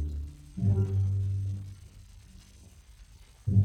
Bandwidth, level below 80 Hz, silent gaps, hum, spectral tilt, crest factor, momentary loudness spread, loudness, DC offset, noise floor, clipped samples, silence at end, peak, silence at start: 8.8 kHz; -46 dBFS; none; none; -9.5 dB/octave; 18 dB; 25 LU; -31 LUFS; under 0.1%; -53 dBFS; under 0.1%; 0 s; -12 dBFS; 0 s